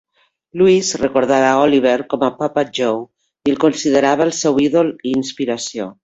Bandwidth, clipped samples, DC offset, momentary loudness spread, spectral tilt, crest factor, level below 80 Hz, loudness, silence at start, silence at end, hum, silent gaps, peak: 8.2 kHz; under 0.1%; under 0.1%; 8 LU; -4.5 dB/octave; 16 dB; -54 dBFS; -16 LUFS; 0.55 s; 0.1 s; none; none; 0 dBFS